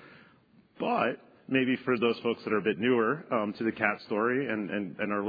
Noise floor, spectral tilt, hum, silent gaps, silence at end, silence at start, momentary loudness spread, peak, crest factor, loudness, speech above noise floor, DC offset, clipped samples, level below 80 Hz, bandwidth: -61 dBFS; -8.5 dB/octave; none; none; 0 s; 0 s; 5 LU; -10 dBFS; 20 dB; -29 LUFS; 32 dB; under 0.1%; under 0.1%; -76 dBFS; 5 kHz